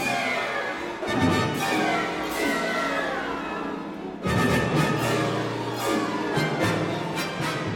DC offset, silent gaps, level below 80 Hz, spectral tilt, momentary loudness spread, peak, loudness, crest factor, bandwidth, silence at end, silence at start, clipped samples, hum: under 0.1%; none; -50 dBFS; -5 dB/octave; 8 LU; -10 dBFS; -25 LUFS; 16 dB; 18 kHz; 0 s; 0 s; under 0.1%; none